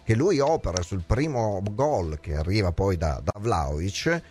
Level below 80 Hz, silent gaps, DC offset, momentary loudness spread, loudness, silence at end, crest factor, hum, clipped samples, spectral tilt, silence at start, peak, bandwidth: -36 dBFS; none; under 0.1%; 6 LU; -26 LUFS; 0 s; 18 dB; none; under 0.1%; -6 dB/octave; 0.05 s; -8 dBFS; 13 kHz